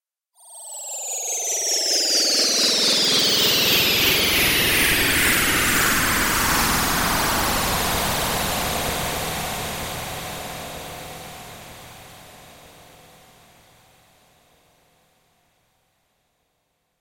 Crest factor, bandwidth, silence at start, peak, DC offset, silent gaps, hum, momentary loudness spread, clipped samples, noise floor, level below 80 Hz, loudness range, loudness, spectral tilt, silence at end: 18 dB; 16 kHz; 0.45 s; -6 dBFS; under 0.1%; none; none; 19 LU; under 0.1%; -72 dBFS; -40 dBFS; 17 LU; -18 LUFS; -1.5 dB/octave; 4.45 s